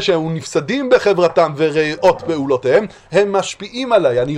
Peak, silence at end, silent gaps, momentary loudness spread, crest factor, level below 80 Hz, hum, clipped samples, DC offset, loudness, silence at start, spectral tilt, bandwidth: 0 dBFS; 0 s; none; 6 LU; 16 dB; -50 dBFS; none; under 0.1%; under 0.1%; -16 LUFS; 0 s; -5 dB/octave; 11 kHz